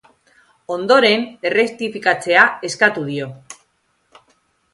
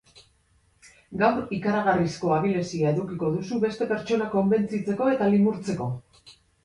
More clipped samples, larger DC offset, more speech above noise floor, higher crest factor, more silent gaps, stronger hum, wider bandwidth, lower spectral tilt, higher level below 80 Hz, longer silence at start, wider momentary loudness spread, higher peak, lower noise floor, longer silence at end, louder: neither; neither; first, 48 dB vs 40 dB; about the same, 18 dB vs 18 dB; neither; neither; about the same, 11.5 kHz vs 11 kHz; second, -3.5 dB/octave vs -7 dB/octave; second, -66 dBFS vs -58 dBFS; first, 0.7 s vs 0.15 s; first, 15 LU vs 7 LU; first, 0 dBFS vs -8 dBFS; about the same, -65 dBFS vs -64 dBFS; first, 1.2 s vs 0.35 s; first, -16 LUFS vs -25 LUFS